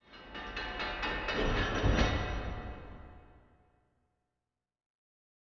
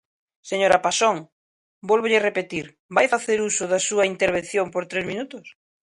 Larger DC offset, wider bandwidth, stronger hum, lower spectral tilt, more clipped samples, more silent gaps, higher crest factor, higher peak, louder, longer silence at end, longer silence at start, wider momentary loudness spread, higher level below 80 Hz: neither; second, 7.4 kHz vs 11.5 kHz; neither; about the same, -3.5 dB/octave vs -2.5 dB/octave; neither; second, none vs 1.32-1.81 s, 2.79-2.89 s; about the same, 20 dB vs 20 dB; second, -16 dBFS vs -2 dBFS; second, -34 LUFS vs -22 LUFS; first, 2.1 s vs 0.45 s; second, 0.1 s vs 0.45 s; first, 17 LU vs 13 LU; first, -40 dBFS vs -60 dBFS